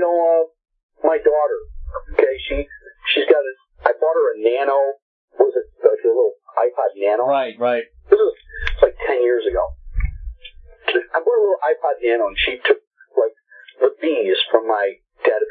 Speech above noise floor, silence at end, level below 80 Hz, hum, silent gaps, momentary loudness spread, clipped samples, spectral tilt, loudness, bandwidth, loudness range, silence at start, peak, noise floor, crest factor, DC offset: 28 dB; 0 s; -36 dBFS; none; 0.83-0.89 s, 5.02-5.28 s, 12.87-12.91 s; 11 LU; under 0.1%; -7.5 dB/octave; -19 LUFS; 4.7 kHz; 2 LU; 0 s; 0 dBFS; -46 dBFS; 18 dB; under 0.1%